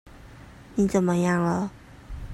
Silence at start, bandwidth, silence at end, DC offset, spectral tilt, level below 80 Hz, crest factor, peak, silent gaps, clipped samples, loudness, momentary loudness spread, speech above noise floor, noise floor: 0.05 s; 12.5 kHz; 0 s; under 0.1%; -7 dB/octave; -46 dBFS; 16 dB; -10 dBFS; none; under 0.1%; -25 LUFS; 16 LU; 23 dB; -46 dBFS